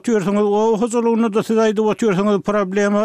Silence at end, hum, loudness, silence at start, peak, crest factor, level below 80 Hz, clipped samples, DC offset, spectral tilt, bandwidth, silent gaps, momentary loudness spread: 0 s; none; -17 LUFS; 0.05 s; -6 dBFS; 10 dB; -54 dBFS; under 0.1%; under 0.1%; -6 dB/octave; 12 kHz; none; 2 LU